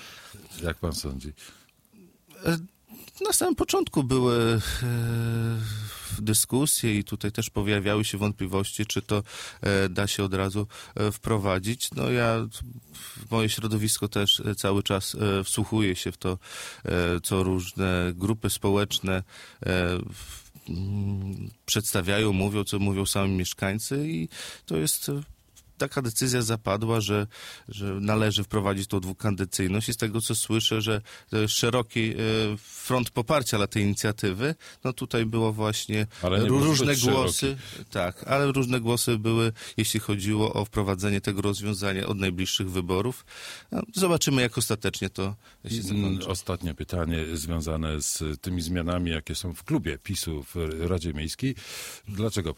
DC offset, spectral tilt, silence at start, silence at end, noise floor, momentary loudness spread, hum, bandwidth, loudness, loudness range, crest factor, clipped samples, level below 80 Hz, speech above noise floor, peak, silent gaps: under 0.1%; -4.5 dB/octave; 0 s; 0.05 s; -56 dBFS; 11 LU; none; 16.5 kHz; -27 LUFS; 4 LU; 18 dB; under 0.1%; -48 dBFS; 29 dB; -8 dBFS; none